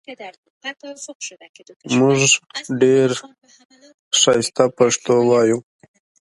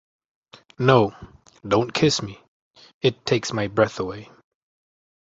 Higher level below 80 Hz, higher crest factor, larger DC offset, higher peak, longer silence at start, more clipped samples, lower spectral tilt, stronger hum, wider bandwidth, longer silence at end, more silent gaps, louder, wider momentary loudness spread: second, -64 dBFS vs -54 dBFS; about the same, 18 dB vs 22 dB; neither; about the same, 0 dBFS vs -2 dBFS; second, 0.1 s vs 0.8 s; neither; second, -3.5 dB/octave vs -5 dB/octave; neither; first, 11.5 kHz vs 8 kHz; second, 0.65 s vs 1.05 s; first, 0.38-0.43 s, 0.50-0.61 s, 1.15-1.20 s, 1.49-1.54 s, 1.76-1.80 s, 3.65-3.69 s, 3.94-4.11 s vs 2.48-2.74 s, 2.94-3.01 s; first, -16 LUFS vs -22 LUFS; first, 18 LU vs 14 LU